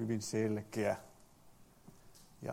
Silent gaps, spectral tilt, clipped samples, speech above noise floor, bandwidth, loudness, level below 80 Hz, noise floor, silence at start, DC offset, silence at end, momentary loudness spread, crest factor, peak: none; -5.5 dB/octave; under 0.1%; 25 dB; 16.5 kHz; -38 LUFS; -70 dBFS; -62 dBFS; 0 s; under 0.1%; 0 s; 12 LU; 18 dB; -22 dBFS